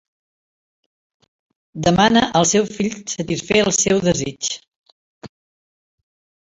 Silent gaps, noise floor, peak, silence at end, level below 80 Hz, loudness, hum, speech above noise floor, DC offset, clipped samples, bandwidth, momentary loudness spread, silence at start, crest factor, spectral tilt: 4.68-4.84 s, 4.92-5.21 s; under -90 dBFS; -2 dBFS; 1.25 s; -48 dBFS; -17 LUFS; none; over 72 dB; under 0.1%; under 0.1%; 8 kHz; 11 LU; 1.75 s; 20 dB; -3.5 dB/octave